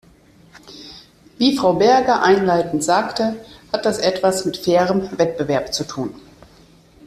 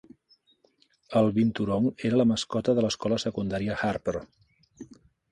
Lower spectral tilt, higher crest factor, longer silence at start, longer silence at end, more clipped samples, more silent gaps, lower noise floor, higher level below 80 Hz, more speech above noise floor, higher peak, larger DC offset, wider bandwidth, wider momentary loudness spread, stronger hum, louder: second, -4.5 dB/octave vs -6 dB/octave; about the same, 16 dB vs 18 dB; second, 0.65 s vs 1.1 s; first, 0.9 s vs 0.45 s; neither; neither; second, -50 dBFS vs -66 dBFS; about the same, -52 dBFS vs -56 dBFS; second, 32 dB vs 40 dB; first, -2 dBFS vs -10 dBFS; neither; first, 14.5 kHz vs 11 kHz; first, 15 LU vs 6 LU; neither; first, -18 LUFS vs -27 LUFS